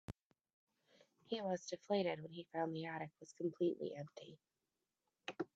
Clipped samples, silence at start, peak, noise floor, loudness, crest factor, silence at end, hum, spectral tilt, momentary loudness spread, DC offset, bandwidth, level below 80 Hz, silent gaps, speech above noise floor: under 0.1%; 0.1 s; -24 dBFS; under -90 dBFS; -44 LUFS; 20 dB; 0.1 s; none; -5.5 dB/octave; 16 LU; under 0.1%; 8 kHz; -78 dBFS; 0.26-0.30 s, 0.53-0.67 s; over 47 dB